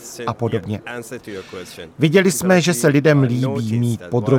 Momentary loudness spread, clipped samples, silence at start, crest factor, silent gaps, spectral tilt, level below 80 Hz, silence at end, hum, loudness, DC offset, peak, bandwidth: 17 LU; under 0.1%; 0 s; 16 dB; none; -5.5 dB/octave; -56 dBFS; 0 s; none; -17 LUFS; under 0.1%; -2 dBFS; 17 kHz